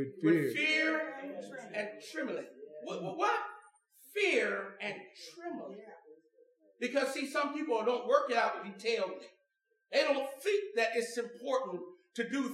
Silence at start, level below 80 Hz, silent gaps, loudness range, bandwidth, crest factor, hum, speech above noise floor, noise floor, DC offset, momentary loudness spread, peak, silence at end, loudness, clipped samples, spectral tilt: 0 s; under -90 dBFS; none; 4 LU; 15.5 kHz; 22 dB; none; 46 dB; -79 dBFS; under 0.1%; 16 LU; -12 dBFS; 0 s; -34 LUFS; under 0.1%; -4 dB/octave